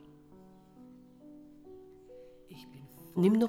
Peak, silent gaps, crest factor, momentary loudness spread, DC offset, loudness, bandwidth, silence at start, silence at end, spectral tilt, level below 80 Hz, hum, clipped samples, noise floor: -16 dBFS; none; 20 dB; 22 LU; under 0.1%; -30 LUFS; 15.5 kHz; 1.7 s; 0 s; -8.5 dB/octave; -70 dBFS; none; under 0.1%; -56 dBFS